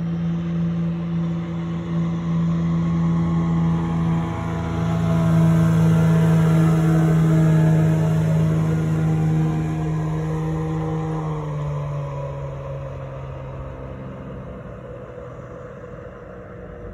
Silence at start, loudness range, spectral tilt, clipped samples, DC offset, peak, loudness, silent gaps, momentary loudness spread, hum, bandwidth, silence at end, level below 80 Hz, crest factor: 0 s; 16 LU; -8.5 dB/octave; under 0.1%; under 0.1%; -6 dBFS; -20 LUFS; none; 19 LU; none; 8 kHz; 0 s; -40 dBFS; 14 dB